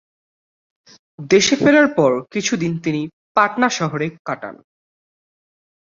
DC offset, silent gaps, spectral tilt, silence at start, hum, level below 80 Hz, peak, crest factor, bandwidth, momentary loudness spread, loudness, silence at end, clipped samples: under 0.1%; 3.13-3.35 s, 4.19-4.25 s; -4 dB/octave; 1.2 s; none; -60 dBFS; -2 dBFS; 18 dB; 7.6 kHz; 15 LU; -17 LUFS; 1.4 s; under 0.1%